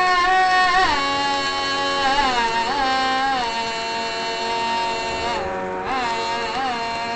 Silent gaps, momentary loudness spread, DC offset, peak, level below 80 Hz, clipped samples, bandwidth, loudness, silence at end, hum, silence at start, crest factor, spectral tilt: none; 8 LU; under 0.1%; -4 dBFS; -44 dBFS; under 0.1%; 9 kHz; -20 LUFS; 0 s; none; 0 s; 16 dB; -2 dB/octave